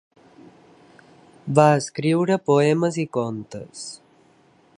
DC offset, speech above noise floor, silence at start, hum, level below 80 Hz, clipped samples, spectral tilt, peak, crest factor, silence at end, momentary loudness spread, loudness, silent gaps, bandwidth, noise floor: under 0.1%; 36 dB; 1.45 s; none; -66 dBFS; under 0.1%; -6 dB/octave; -2 dBFS; 22 dB; 0.8 s; 19 LU; -20 LUFS; none; 11 kHz; -57 dBFS